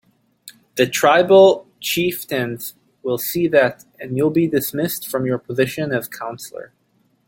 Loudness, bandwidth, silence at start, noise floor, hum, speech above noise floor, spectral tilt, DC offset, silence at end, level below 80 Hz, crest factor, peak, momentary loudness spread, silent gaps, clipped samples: -18 LUFS; 17 kHz; 0.45 s; -46 dBFS; none; 28 dB; -4.5 dB/octave; under 0.1%; 0.65 s; -60 dBFS; 18 dB; -2 dBFS; 18 LU; none; under 0.1%